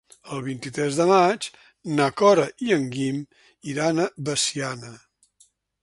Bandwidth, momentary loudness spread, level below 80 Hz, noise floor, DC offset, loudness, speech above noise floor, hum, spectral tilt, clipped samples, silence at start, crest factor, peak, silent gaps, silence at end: 11.5 kHz; 18 LU; -64 dBFS; -61 dBFS; under 0.1%; -23 LUFS; 39 dB; none; -4.5 dB/octave; under 0.1%; 0.25 s; 20 dB; -4 dBFS; none; 0.85 s